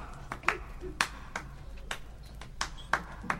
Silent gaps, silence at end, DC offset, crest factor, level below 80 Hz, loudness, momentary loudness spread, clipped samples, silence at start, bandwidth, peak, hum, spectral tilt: none; 0 s; under 0.1%; 30 dB; -46 dBFS; -36 LUFS; 16 LU; under 0.1%; 0 s; 16 kHz; -6 dBFS; none; -2.5 dB/octave